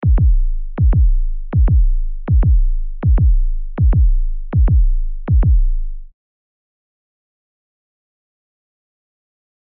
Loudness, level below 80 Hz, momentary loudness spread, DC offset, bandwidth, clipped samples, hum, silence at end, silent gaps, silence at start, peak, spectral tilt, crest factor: -17 LUFS; -16 dBFS; 10 LU; under 0.1%; 2.4 kHz; under 0.1%; none; 3.6 s; none; 0 s; -6 dBFS; -11.5 dB/octave; 8 dB